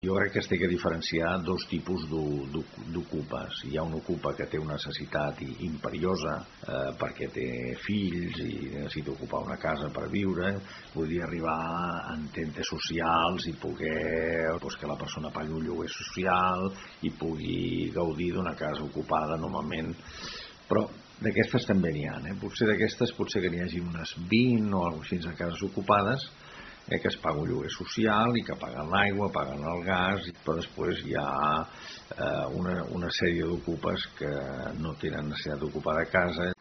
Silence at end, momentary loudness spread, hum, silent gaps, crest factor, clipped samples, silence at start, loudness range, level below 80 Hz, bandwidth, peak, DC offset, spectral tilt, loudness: 0.05 s; 10 LU; none; none; 24 dB; under 0.1%; 0.05 s; 5 LU; -54 dBFS; 6.4 kHz; -6 dBFS; under 0.1%; -4.5 dB/octave; -31 LUFS